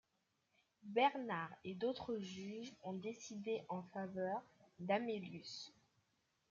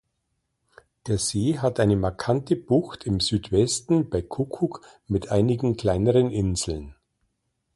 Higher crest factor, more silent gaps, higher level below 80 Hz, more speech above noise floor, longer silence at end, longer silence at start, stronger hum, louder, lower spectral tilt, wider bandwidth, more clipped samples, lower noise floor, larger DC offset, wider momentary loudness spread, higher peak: about the same, 22 dB vs 18 dB; neither; second, -84 dBFS vs -44 dBFS; second, 41 dB vs 53 dB; about the same, 0.8 s vs 0.85 s; second, 0.85 s vs 1.05 s; neither; second, -44 LUFS vs -24 LUFS; about the same, -5 dB/octave vs -5.5 dB/octave; second, 7.6 kHz vs 11.5 kHz; neither; first, -84 dBFS vs -76 dBFS; neither; first, 13 LU vs 8 LU; second, -22 dBFS vs -8 dBFS